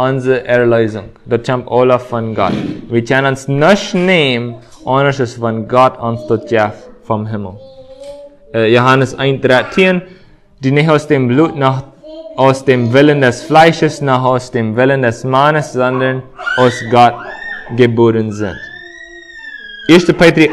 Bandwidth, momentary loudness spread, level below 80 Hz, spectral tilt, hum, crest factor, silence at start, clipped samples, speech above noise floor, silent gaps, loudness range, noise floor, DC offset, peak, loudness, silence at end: 12.5 kHz; 16 LU; -44 dBFS; -6 dB/octave; none; 12 dB; 0 s; 0.4%; 22 dB; none; 4 LU; -33 dBFS; under 0.1%; 0 dBFS; -12 LUFS; 0 s